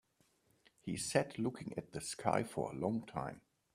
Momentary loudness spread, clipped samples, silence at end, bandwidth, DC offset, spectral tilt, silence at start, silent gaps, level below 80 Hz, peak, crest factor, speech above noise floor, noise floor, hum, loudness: 11 LU; under 0.1%; 0.35 s; 15 kHz; under 0.1%; -5 dB/octave; 0.85 s; none; -70 dBFS; -16 dBFS; 24 dB; 36 dB; -75 dBFS; none; -39 LUFS